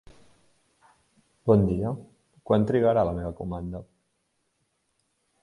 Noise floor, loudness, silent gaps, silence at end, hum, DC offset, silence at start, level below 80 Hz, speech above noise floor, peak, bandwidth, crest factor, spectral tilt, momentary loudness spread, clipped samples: -74 dBFS; -25 LUFS; none; 1.6 s; none; under 0.1%; 1.45 s; -48 dBFS; 51 dB; -6 dBFS; 11 kHz; 22 dB; -9.5 dB/octave; 15 LU; under 0.1%